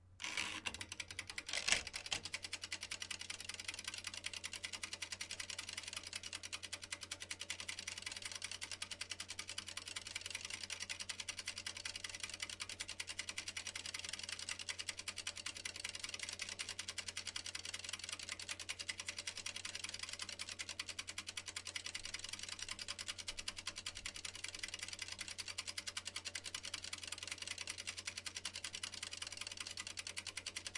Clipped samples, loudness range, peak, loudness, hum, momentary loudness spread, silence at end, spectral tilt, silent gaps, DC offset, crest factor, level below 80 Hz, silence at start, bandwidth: under 0.1%; 3 LU; -16 dBFS; -45 LUFS; none; 2 LU; 0 s; 0 dB/octave; none; under 0.1%; 32 dB; -70 dBFS; 0 s; 11.5 kHz